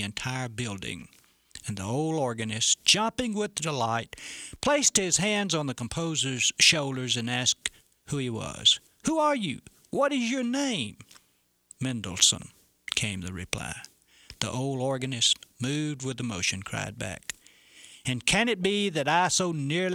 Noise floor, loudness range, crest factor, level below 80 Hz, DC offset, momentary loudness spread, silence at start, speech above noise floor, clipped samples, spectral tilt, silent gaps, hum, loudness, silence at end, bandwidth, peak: -69 dBFS; 5 LU; 24 dB; -58 dBFS; under 0.1%; 14 LU; 0 s; 41 dB; under 0.1%; -2.5 dB/octave; none; none; -26 LUFS; 0 s; 16.5 kHz; -6 dBFS